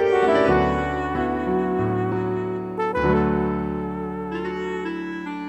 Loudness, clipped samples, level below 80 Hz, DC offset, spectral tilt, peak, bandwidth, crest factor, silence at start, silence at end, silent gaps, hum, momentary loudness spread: -23 LUFS; under 0.1%; -40 dBFS; under 0.1%; -8 dB/octave; -6 dBFS; 8.4 kHz; 16 dB; 0 s; 0 s; none; none; 11 LU